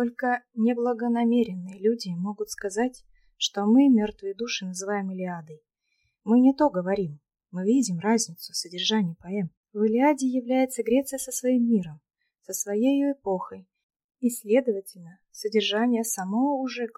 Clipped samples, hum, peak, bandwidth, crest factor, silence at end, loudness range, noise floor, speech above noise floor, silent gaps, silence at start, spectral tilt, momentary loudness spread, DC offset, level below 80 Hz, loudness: under 0.1%; none; -8 dBFS; 15.5 kHz; 16 dB; 0.1 s; 3 LU; -74 dBFS; 50 dB; 9.57-9.64 s, 13.83-13.89 s, 14.04-14.09 s; 0 s; -4.5 dB/octave; 11 LU; under 0.1%; -66 dBFS; -25 LUFS